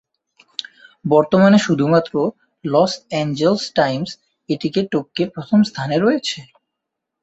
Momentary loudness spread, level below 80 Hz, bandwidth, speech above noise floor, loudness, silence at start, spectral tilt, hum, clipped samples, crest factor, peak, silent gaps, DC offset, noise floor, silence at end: 18 LU; -58 dBFS; 8 kHz; 63 dB; -18 LUFS; 1.05 s; -6 dB/octave; none; under 0.1%; 16 dB; -2 dBFS; none; under 0.1%; -80 dBFS; 0.8 s